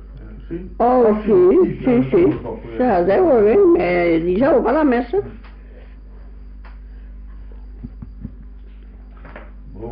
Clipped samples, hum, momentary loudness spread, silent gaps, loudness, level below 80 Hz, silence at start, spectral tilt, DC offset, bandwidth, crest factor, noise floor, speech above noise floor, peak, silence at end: under 0.1%; none; 24 LU; none; -15 LUFS; -36 dBFS; 0 s; -7 dB/octave; under 0.1%; 5.2 kHz; 12 dB; -37 dBFS; 22 dB; -6 dBFS; 0 s